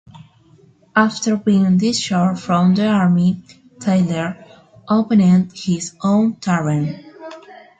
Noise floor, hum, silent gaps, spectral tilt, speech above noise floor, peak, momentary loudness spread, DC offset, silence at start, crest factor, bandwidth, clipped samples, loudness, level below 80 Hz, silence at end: -50 dBFS; none; none; -6 dB/octave; 35 dB; -2 dBFS; 12 LU; under 0.1%; 0.95 s; 16 dB; 9.2 kHz; under 0.1%; -17 LUFS; -56 dBFS; 0.25 s